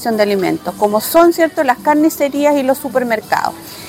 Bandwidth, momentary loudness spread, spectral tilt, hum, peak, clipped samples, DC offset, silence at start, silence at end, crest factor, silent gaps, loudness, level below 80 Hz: 17 kHz; 7 LU; -4.5 dB/octave; none; 0 dBFS; under 0.1%; under 0.1%; 0 s; 0 s; 14 dB; none; -14 LUFS; -52 dBFS